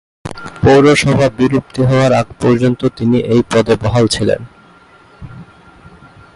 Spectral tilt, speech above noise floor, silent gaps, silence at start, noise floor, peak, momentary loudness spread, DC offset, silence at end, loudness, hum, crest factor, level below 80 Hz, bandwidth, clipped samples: -6 dB/octave; 32 dB; none; 0.25 s; -43 dBFS; 0 dBFS; 8 LU; under 0.1%; 0.9 s; -12 LUFS; none; 14 dB; -38 dBFS; 11.5 kHz; under 0.1%